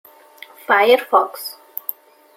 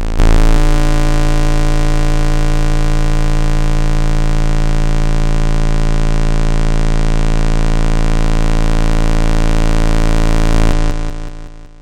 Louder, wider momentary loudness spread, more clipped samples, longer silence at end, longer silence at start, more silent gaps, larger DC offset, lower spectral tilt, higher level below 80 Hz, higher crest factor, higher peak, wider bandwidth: about the same, -17 LUFS vs -17 LUFS; first, 17 LU vs 2 LU; neither; first, 0.85 s vs 0.15 s; first, 0.7 s vs 0 s; neither; neither; second, -2 dB/octave vs -6 dB/octave; second, -74 dBFS vs -10 dBFS; first, 18 dB vs 10 dB; about the same, -2 dBFS vs 0 dBFS; first, 17 kHz vs 10 kHz